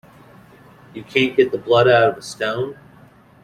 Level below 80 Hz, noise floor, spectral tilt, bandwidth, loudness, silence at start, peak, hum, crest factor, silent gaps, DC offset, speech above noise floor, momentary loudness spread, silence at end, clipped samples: -58 dBFS; -48 dBFS; -5.5 dB/octave; 13.5 kHz; -18 LUFS; 0.95 s; -2 dBFS; none; 18 dB; none; under 0.1%; 31 dB; 15 LU; 0.7 s; under 0.1%